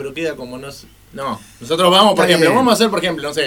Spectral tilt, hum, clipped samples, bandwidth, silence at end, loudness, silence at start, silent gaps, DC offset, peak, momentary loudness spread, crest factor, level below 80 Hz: -4 dB/octave; none; under 0.1%; 18.5 kHz; 0 s; -14 LUFS; 0 s; none; under 0.1%; 0 dBFS; 19 LU; 16 dB; -50 dBFS